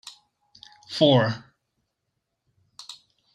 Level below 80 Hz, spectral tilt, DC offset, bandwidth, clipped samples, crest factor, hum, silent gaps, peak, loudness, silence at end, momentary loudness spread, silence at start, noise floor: -70 dBFS; -6 dB/octave; under 0.1%; 11 kHz; under 0.1%; 24 dB; none; none; -4 dBFS; -21 LUFS; 0.4 s; 25 LU; 0.9 s; -79 dBFS